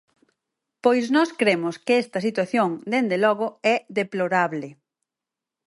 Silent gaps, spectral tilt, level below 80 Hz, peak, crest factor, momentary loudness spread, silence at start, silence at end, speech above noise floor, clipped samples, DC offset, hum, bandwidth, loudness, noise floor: none; -5.5 dB/octave; -76 dBFS; -4 dBFS; 18 dB; 6 LU; 0.85 s; 0.95 s; 66 dB; under 0.1%; under 0.1%; none; 11.5 kHz; -22 LUFS; -88 dBFS